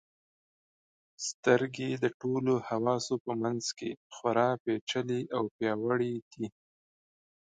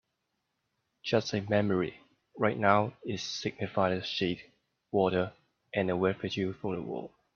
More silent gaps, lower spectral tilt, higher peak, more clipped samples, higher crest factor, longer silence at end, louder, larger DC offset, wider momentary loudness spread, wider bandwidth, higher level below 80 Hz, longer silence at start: first, 1.34-1.43 s, 2.14-2.20 s, 3.20-3.25 s, 3.97-4.10 s, 4.60-4.65 s, 4.81-4.87 s, 5.51-5.59 s, 6.22-6.31 s vs none; about the same, -5 dB/octave vs -5.5 dB/octave; about the same, -10 dBFS vs -8 dBFS; neither; about the same, 24 dB vs 24 dB; first, 1.05 s vs 0.3 s; about the same, -32 LUFS vs -31 LUFS; neither; about the same, 10 LU vs 9 LU; first, 9.4 kHz vs 7.2 kHz; second, -76 dBFS vs -68 dBFS; first, 1.2 s vs 1.05 s